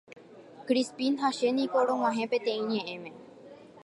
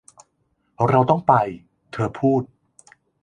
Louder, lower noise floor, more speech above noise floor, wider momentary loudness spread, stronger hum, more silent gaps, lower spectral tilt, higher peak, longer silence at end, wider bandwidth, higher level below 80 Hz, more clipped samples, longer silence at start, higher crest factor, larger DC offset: second, -29 LUFS vs -20 LUFS; second, -50 dBFS vs -69 dBFS; second, 22 dB vs 50 dB; second, 16 LU vs 20 LU; neither; neither; second, -4.5 dB/octave vs -8.5 dB/octave; second, -14 dBFS vs -2 dBFS; second, 0.05 s vs 0.75 s; first, 11.5 kHz vs 10 kHz; second, -82 dBFS vs -56 dBFS; neither; second, 0.1 s vs 0.8 s; about the same, 16 dB vs 20 dB; neither